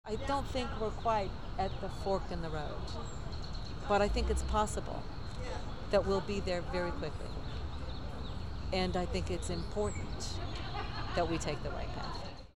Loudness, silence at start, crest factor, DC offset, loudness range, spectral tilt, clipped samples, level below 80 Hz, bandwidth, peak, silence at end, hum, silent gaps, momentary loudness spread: -37 LUFS; 0.05 s; 18 dB; 0.7%; 3 LU; -5.5 dB/octave; under 0.1%; -42 dBFS; 13.5 kHz; -18 dBFS; 0 s; none; none; 10 LU